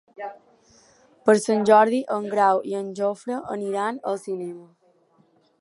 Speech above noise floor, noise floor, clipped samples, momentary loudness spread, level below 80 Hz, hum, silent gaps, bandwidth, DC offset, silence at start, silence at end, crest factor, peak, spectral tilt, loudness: 39 dB; -61 dBFS; under 0.1%; 19 LU; -74 dBFS; none; none; 11.5 kHz; under 0.1%; 0.2 s; 0.95 s; 22 dB; -2 dBFS; -5 dB/octave; -22 LUFS